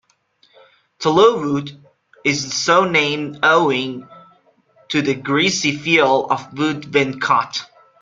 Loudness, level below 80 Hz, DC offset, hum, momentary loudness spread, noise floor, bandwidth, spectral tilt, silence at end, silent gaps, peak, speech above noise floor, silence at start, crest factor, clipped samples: -17 LUFS; -60 dBFS; under 0.1%; none; 9 LU; -59 dBFS; 9.4 kHz; -4 dB/octave; 0.35 s; none; -2 dBFS; 42 dB; 1 s; 18 dB; under 0.1%